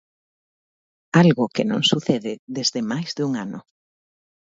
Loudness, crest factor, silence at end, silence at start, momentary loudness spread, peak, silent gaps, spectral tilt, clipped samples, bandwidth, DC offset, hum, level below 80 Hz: -21 LUFS; 22 dB; 0.9 s; 1.15 s; 13 LU; -2 dBFS; 2.39-2.47 s; -5 dB/octave; under 0.1%; 7.8 kHz; under 0.1%; none; -64 dBFS